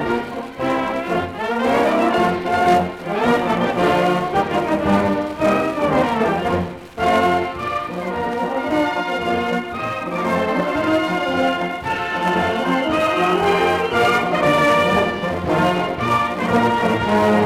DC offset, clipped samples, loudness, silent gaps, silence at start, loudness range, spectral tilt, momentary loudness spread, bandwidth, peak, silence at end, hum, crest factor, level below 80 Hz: under 0.1%; under 0.1%; -19 LUFS; none; 0 s; 4 LU; -6 dB/octave; 7 LU; 16.5 kHz; -4 dBFS; 0 s; none; 14 dB; -46 dBFS